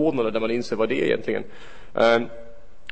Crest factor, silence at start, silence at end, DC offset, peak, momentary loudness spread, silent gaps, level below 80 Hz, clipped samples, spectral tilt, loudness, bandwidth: 18 dB; 0 s; 0.4 s; 2%; -6 dBFS; 16 LU; none; -52 dBFS; under 0.1%; -5.5 dB/octave; -23 LUFS; 8.6 kHz